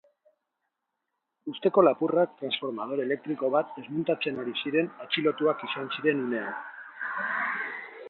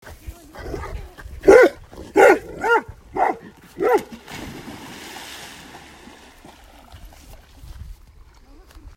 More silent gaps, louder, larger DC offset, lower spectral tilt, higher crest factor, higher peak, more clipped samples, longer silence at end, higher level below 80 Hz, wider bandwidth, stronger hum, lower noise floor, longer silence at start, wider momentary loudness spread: neither; second, -28 LUFS vs -17 LUFS; neither; first, -9 dB/octave vs -5 dB/octave; about the same, 22 dB vs 22 dB; second, -8 dBFS vs 0 dBFS; neither; second, 0 s vs 1.15 s; second, -78 dBFS vs -42 dBFS; second, 4.4 kHz vs 16 kHz; neither; first, -83 dBFS vs -47 dBFS; first, 1.45 s vs 0.1 s; second, 12 LU vs 27 LU